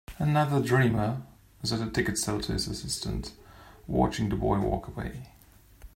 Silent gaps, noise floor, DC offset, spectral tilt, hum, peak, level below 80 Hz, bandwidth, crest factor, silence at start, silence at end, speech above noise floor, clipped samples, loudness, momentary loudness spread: none; -53 dBFS; under 0.1%; -5.5 dB/octave; none; -10 dBFS; -44 dBFS; 16 kHz; 20 dB; 0.1 s; 0.1 s; 25 dB; under 0.1%; -29 LUFS; 14 LU